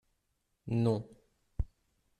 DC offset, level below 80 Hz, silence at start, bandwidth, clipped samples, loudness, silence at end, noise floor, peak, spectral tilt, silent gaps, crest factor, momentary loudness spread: under 0.1%; -48 dBFS; 0.65 s; 9.4 kHz; under 0.1%; -35 LUFS; 0.55 s; -80 dBFS; -18 dBFS; -9 dB/octave; none; 18 dB; 20 LU